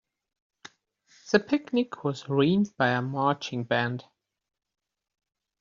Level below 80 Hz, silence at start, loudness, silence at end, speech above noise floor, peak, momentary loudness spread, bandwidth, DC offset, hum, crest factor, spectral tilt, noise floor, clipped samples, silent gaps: -68 dBFS; 1.25 s; -27 LUFS; 1.6 s; 37 dB; -6 dBFS; 7 LU; 7.6 kHz; under 0.1%; none; 24 dB; -5 dB/octave; -64 dBFS; under 0.1%; none